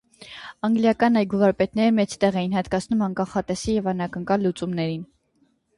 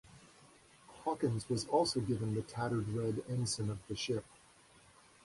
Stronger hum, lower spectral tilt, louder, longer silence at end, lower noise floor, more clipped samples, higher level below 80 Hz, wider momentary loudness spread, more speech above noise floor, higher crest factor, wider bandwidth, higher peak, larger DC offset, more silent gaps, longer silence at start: neither; about the same, -6.5 dB/octave vs -5.5 dB/octave; first, -23 LUFS vs -37 LUFS; second, 0.75 s vs 1 s; about the same, -65 dBFS vs -63 dBFS; neither; first, -52 dBFS vs -64 dBFS; about the same, 9 LU vs 8 LU; first, 43 dB vs 27 dB; about the same, 16 dB vs 20 dB; about the same, 11.5 kHz vs 11.5 kHz; first, -6 dBFS vs -18 dBFS; neither; neither; first, 0.2 s vs 0.05 s